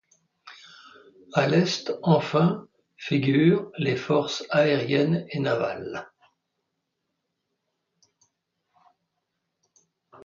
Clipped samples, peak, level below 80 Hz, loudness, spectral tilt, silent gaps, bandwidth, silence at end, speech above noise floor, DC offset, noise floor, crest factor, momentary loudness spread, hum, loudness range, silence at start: under 0.1%; -6 dBFS; -68 dBFS; -24 LUFS; -6.5 dB/octave; none; 7.4 kHz; 4.2 s; 57 dB; under 0.1%; -80 dBFS; 20 dB; 14 LU; none; 10 LU; 0.45 s